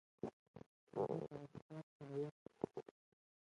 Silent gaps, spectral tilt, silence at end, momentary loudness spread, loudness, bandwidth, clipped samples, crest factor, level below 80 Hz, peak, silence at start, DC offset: 0.33-0.54 s, 0.66-0.87 s, 1.62-1.69 s, 1.83-2.00 s, 2.31-2.46 s; -9 dB/octave; 0.7 s; 20 LU; -49 LUFS; 11 kHz; under 0.1%; 24 dB; -82 dBFS; -26 dBFS; 0.25 s; under 0.1%